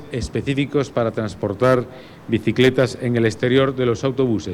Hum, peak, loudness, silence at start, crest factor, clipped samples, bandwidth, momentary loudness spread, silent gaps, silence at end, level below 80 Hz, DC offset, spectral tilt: none; -4 dBFS; -20 LUFS; 0 s; 14 dB; under 0.1%; 13.5 kHz; 8 LU; none; 0 s; -44 dBFS; under 0.1%; -6.5 dB/octave